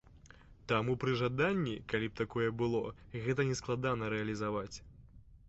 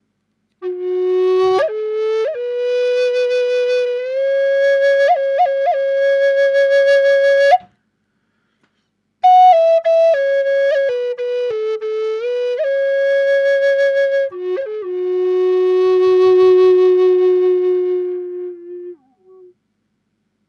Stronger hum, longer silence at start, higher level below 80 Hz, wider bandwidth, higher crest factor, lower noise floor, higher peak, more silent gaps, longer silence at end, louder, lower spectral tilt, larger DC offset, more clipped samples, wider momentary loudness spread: neither; second, 0.1 s vs 0.6 s; first, -58 dBFS vs -70 dBFS; second, 8 kHz vs 9 kHz; first, 20 dB vs 14 dB; second, -58 dBFS vs -68 dBFS; second, -16 dBFS vs -2 dBFS; neither; second, 0.15 s vs 1.55 s; second, -35 LUFS vs -15 LUFS; about the same, -5 dB/octave vs -4 dB/octave; neither; neither; about the same, 8 LU vs 10 LU